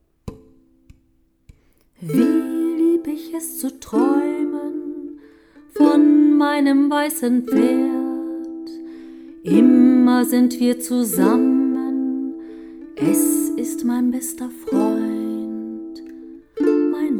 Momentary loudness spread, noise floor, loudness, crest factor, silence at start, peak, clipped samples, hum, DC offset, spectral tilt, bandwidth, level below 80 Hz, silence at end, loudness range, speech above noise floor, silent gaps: 22 LU; -60 dBFS; -18 LUFS; 18 dB; 0.25 s; -2 dBFS; under 0.1%; none; under 0.1%; -5 dB/octave; 19 kHz; -56 dBFS; 0 s; 6 LU; 44 dB; none